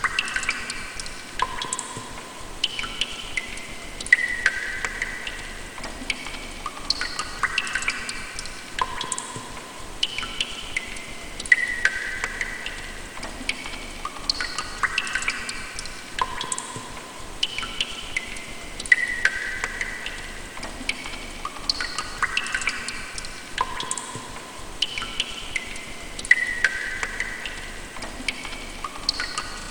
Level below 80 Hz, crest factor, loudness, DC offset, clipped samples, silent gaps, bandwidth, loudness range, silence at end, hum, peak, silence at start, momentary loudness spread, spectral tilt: -42 dBFS; 28 dB; -26 LUFS; under 0.1%; under 0.1%; none; 19.5 kHz; 4 LU; 0 s; none; 0 dBFS; 0 s; 15 LU; -1 dB/octave